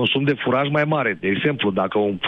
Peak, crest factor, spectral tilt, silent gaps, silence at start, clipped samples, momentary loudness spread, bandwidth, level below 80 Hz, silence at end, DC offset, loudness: -8 dBFS; 12 dB; -8 dB/octave; none; 0 s; under 0.1%; 2 LU; 6 kHz; -58 dBFS; 0 s; under 0.1%; -20 LUFS